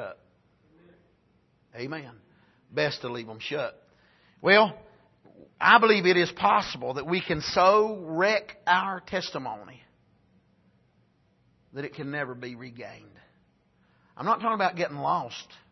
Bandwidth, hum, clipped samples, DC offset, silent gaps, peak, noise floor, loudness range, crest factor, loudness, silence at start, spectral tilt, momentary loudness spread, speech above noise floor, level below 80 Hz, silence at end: 6.2 kHz; none; under 0.1%; under 0.1%; none; -2 dBFS; -66 dBFS; 17 LU; 26 dB; -25 LUFS; 0 s; -5 dB/octave; 20 LU; 40 dB; -64 dBFS; 0.3 s